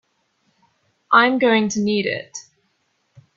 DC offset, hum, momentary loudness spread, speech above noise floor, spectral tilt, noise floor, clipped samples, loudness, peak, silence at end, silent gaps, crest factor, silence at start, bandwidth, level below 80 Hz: under 0.1%; none; 18 LU; 50 dB; -4 dB/octave; -68 dBFS; under 0.1%; -18 LUFS; 0 dBFS; 0.95 s; none; 20 dB; 1.1 s; 7.6 kHz; -66 dBFS